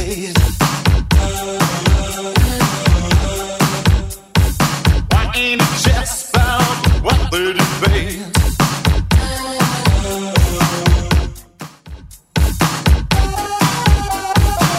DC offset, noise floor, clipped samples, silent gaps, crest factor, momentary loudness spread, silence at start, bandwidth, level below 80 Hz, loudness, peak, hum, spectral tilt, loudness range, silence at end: under 0.1%; -35 dBFS; under 0.1%; none; 14 dB; 4 LU; 0 s; 16.5 kHz; -20 dBFS; -15 LUFS; 0 dBFS; none; -4.5 dB/octave; 2 LU; 0 s